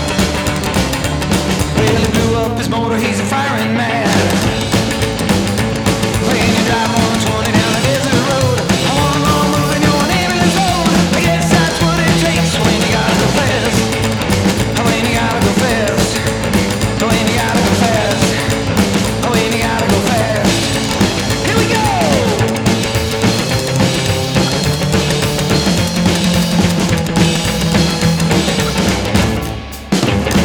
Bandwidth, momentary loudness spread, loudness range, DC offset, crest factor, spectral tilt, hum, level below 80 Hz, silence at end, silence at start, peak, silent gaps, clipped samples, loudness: over 20 kHz; 3 LU; 2 LU; under 0.1%; 12 dB; -4.5 dB/octave; none; -28 dBFS; 0 s; 0 s; 0 dBFS; none; under 0.1%; -13 LUFS